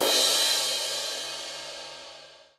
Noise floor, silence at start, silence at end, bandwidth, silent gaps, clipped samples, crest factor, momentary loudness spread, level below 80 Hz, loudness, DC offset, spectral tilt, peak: -49 dBFS; 0 s; 0.2 s; 16 kHz; none; under 0.1%; 18 dB; 20 LU; -72 dBFS; -24 LUFS; under 0.1%; 1.5 dB/octave; -12 dBFS